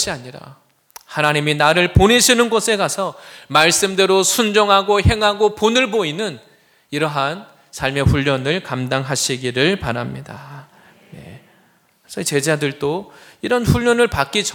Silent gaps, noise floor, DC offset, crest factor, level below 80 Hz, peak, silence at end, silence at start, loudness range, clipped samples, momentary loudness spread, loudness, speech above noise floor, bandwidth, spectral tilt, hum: none; -56 dBFS; under 0.1%; 18 dB; -38 dBFS; 0 dBFS; 0 s; 0 s; 9 LU; under 0.1%; 15 LU; -16 LUFS; 39 dB; 19.5 kHz; -3.5 dB/octave; none